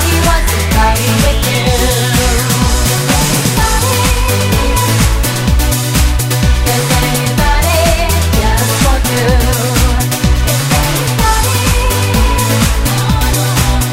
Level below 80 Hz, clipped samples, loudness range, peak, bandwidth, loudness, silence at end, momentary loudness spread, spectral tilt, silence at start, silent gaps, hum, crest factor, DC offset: -14 dBFS; under 0.1%; 1 LU; 0 dBFS; 16.5 kHz; -11 LUFS; 0 s; 2 LU; -4 dB/octave; 0 s; none; none; 10 dB; under 0.1%